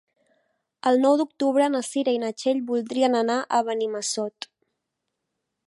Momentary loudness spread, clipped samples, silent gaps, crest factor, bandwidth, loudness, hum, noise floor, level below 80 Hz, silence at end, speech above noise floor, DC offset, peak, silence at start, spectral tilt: 7 LU; under 0.1%; none; 18 dB; 11.5 kHz; -24 LUFS; none; -81 dBFS; -80 dBFS; 1.4 s; 58 dB; under 0.1%; -6 dBFS; 0.85 s; -3 dB/octave